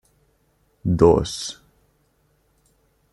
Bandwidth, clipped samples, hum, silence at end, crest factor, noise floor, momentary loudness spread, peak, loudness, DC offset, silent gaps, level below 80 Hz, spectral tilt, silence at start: 12 kHz; under 0.1%; none; 1.6 s; 22 dB; -64 dBFS; 17 LU; -2 dBFS; -20 LUFS; under 0.1%; none; -44 dBFS; -6.5 dB/octave; 0.85 s